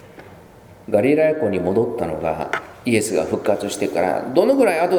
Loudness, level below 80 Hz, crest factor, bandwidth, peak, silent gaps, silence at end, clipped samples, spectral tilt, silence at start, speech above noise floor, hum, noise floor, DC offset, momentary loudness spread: -19 LUFS; -52 dBFS; 18 dB; over 20 kHz; 0 dBFS; none; 0 s; under 0.1%; -5.5 dB/octave; 0.05 s; 26 dB; none; -44 dBFS; under 0.1%; 8 LU